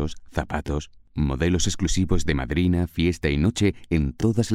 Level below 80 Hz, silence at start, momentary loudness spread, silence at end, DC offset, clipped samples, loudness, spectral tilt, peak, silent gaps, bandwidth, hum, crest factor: -32 dBFS; 0 s; 7 LU; 0 s; under 0.1%; under 0.1%; -24 LUFS; -5.5 dB/octave; -8 dBFS; none; 14 kHz; none; 16 dB